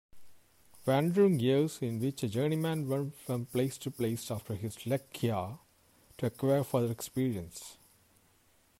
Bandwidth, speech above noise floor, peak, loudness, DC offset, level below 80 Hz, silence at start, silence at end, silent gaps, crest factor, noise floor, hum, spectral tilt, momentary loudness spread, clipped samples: 16 kHz; 36 dB; -16 dBFS; -33 LUFS; under 0.1%; -68 dBFS; 0.15 s; 1.05 s; none; 16 dB; -67 dBFS; none; -6.5 dB/octave; 11 LU; under 0.1%